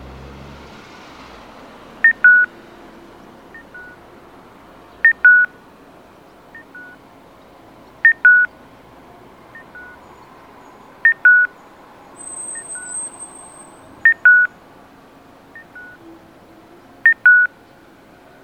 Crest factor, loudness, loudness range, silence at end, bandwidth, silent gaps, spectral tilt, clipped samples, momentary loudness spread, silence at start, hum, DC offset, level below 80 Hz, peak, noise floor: 18 dB; -13 LUFS; 1 LU; 0.95 s; 9 kHz; none; -1.5 dB/octave; under 0.1%; 28 LU; 2.05 s; none; under 0.1%; -54 dBFS; -2 dBFS; -46 dBFS